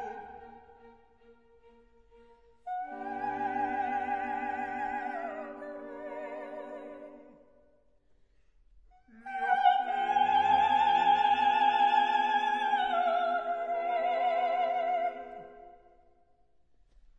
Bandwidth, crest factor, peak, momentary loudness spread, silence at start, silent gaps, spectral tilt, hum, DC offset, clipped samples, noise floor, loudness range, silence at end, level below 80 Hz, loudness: 7.6 kHz; 18 dB; -12 dBFS; 19 LU; 0 s; none; -4 dB/octave; none; under 0.1%; under 0.1%; -69 dBFS; 18 LU; 1.5 s; -68 dBFS; -29 LUFS